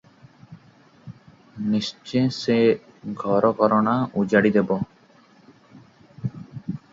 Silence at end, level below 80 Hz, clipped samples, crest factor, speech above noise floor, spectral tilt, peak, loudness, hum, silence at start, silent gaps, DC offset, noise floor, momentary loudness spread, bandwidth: 0.15 s; -60 dBFS; under 0.1%; 20 dB; 34 dB; -7 dB/octave; -4 dBFS; -22 LUFS; none; 0.5 s; none; under 0.1%; -54 dBFS; 15 LU; 7.6 kHz